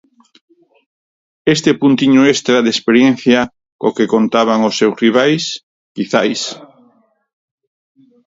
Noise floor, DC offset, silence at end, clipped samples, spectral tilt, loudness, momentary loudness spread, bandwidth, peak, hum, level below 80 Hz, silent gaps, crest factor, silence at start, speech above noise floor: -54 dBFS; under 0.1%; 1.7 s; under 0.1%; -4.5 dB/octave; -13 LUFS; 12 LU; 7.8 kHz; 0 dBFS; none; -58 dBFS; 3.72-3.79 s, 5.63-5.95 s; 14 dB; 1.45 s; 42 dB